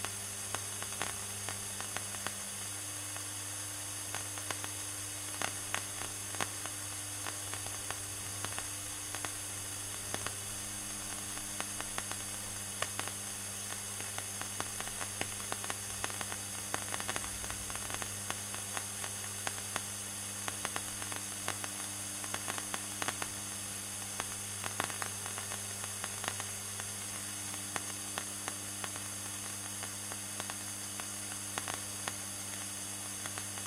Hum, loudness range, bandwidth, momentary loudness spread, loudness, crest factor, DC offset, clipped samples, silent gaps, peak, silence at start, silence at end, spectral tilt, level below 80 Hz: 50 Hz at -50 dBFS; 1 LU; 16 kHz; 2 LU; -38 LUFS; 28 dB; under 0.1%; under 0.1%; none; -12 dBFS; 0 s; 0 s; -1.5 dB/octave; -62 dBFS